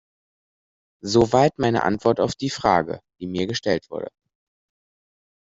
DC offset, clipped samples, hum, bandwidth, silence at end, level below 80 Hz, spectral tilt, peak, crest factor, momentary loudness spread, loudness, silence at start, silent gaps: under 0.1%; under 0.1%; none; 8 kHz; 1.3 s; -54 dBFS; -5.5 dB/octave; -4 dBFS; 20 dB; 15 LU; -21 LUFS; 1.05 s; none